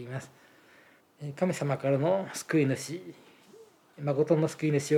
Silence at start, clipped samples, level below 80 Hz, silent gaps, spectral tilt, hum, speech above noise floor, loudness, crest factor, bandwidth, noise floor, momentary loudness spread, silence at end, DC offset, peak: 0 s; under 0.1%; -82 dBFS; none; -6.5 dB/octave; none; 31 dB; -29 LUFS; 18 dB; 16 kHz; -60 dBFS; 15 LU; 0 s; under 0.1%; -12 dBFS